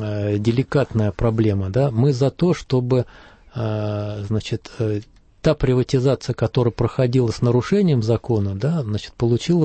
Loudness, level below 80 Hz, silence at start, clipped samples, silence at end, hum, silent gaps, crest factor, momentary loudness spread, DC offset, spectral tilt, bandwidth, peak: -20 LUFS; -40 dBFS; 0 s; under 0.1%; 0 s; none; none; 14 dB; 7 LU; under 0.1%; -7.5 dB/octave; 8.6 kHz; -6 dBFS